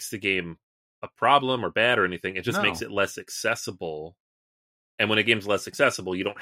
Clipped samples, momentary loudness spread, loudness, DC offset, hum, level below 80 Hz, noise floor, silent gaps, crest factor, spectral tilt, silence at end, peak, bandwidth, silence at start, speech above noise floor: under 0.1%; 14 LU; -24 LUFS; under 0.1%; none; -64 dBFS; under -90 dBFS; 0.63-1.02 s, 4.20-4.98 s; 22 dB; -3.5 dB/octave; 0 s; -4 dBFS; 16 kHz; 0 s; over 65 dB